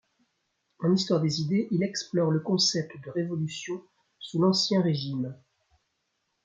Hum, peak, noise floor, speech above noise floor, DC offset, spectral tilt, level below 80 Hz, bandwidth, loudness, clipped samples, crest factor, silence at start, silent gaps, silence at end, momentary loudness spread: none; -10 dBFS; -78 dBFS; 51 dB; under 0.1%; -5 dB/octave; -72 dBFS; 7.8 kHz; -27 LUFS; under 0.1%; 18 dB; 0.8 s; none; 1.1 s; 11 LU